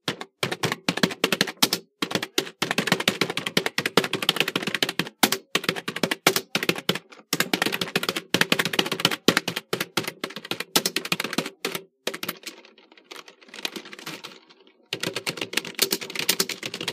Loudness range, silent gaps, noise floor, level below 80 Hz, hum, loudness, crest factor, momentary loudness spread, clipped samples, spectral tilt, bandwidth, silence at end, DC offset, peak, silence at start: 9 LU; none; -56 dBFS; -74 dBFS; none; -25 LUFS; 28 dB; 12 LU; under 0.1%; -2.5 dB/octave; 16 kHz; 0 s; under 0.1%; 0 dBFS; 0.05 s